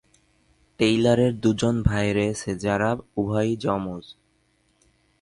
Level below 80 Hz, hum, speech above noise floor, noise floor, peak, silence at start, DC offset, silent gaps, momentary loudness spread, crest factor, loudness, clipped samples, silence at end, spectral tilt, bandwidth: -42 dBFS; none; 43 dB; -66 dBFS; -4 dBFS; 0.8 s; under 0.1%; none; 8 LU; 20 dB; -23 LUFS; under 0.1%; 1.1 s; -6 dB/octave; 11.5 kHz